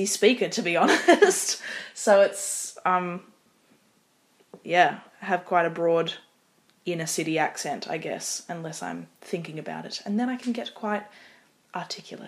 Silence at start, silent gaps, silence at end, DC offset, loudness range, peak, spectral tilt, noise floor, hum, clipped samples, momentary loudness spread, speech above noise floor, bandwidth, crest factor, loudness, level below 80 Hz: 0 s; none; 0 s; under 0.1%; 9 LU; -4 dBFS; -3 dB/octave; -65 dBFS; none; under 0.1%; 16 LU; 40 dB; 15.5 kHz; 22 dB; -25 LUFS; -82 dBFS